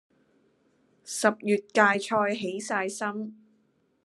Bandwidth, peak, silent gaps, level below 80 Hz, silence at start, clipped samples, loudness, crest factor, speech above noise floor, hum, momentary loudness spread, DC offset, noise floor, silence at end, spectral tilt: 12.5 kHz; -6 dBFS; none; -82 dBFS; 1.05 s; under 0.1%; -27 LUFS; 24 dB; 42 dB; none; 13 LU; under 0.1%; -69 dBFS; 0.7 s; -3.5 dB/octave